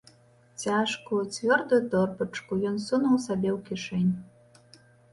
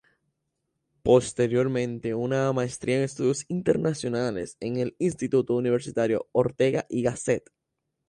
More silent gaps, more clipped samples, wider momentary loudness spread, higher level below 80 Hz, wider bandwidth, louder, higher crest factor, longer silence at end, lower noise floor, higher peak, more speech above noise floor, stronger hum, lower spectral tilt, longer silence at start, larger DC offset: neither; neither; about the same, 9 LU vs 7 LU; second, -64 dBFS vs -58 dBFS; about the same, 11.5 kHz vs 11.5 kHz; about the same, -27 LUFS vs -26 LUFS; about the same, 18 dB vs 18 dB; first, 0.9 s vs 0.7 s; second, -59 dBFS vs -81 dBFS; about the same, -10 dBFS vs -8 dBFS; second, 32 dB vs 56 dB; neither; about the same, -5.5 dB/octave vs -6 dB/octave; second, 0.6 s vs 1.05 s; neither